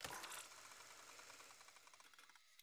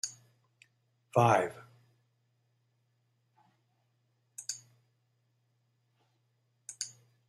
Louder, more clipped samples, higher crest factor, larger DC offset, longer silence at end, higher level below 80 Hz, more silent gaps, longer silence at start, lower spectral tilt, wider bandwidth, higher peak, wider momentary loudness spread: second, -57 LUFS vs -32 LUFS; neither; second, 20 dB vs 28 dB; neither; second, 0 s vs 0.4 s; second, -86 dBFS vs -78 dBFS; neither; about the same, 0 s vs 0.05 s; second, -0.5 dB/octave vs -4.5 dB/octave; first, over 20 kHz vs 14.5 kHz; second, -38 dBFS vs -10 dBFS; second, 13 LU vs 24 LU